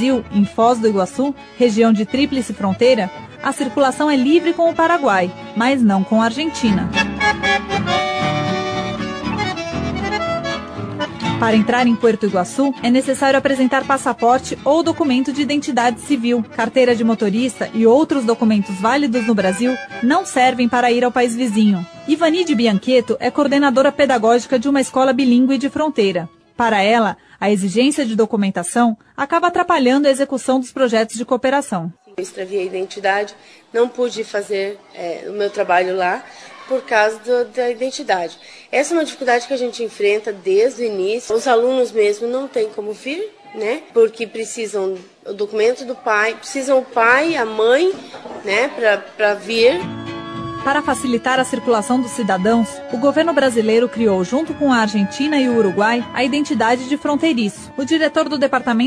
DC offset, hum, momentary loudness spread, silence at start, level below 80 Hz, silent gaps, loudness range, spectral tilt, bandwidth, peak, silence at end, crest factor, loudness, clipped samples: under 0.1%; none; 9 LU; 0 s; -50 dBFS; none; 5 LU; -5 dB/octave; 11 kHz; 0 dBFS; 0 s; 16 dB; -17 LUFS; under 0.1%